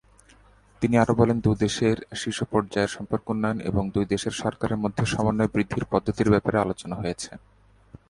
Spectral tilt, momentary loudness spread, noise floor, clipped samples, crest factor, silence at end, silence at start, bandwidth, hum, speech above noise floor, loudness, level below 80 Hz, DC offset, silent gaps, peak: -6 dB/octave; 9 LU; -55 dBFS; under 0.1%; 18 dB; 0.7 s; 0.8 s; 11.5 kHz; none; 31 dB; -25 LUFS; -46 dBFS; under 0.1%; none; -6 dBFS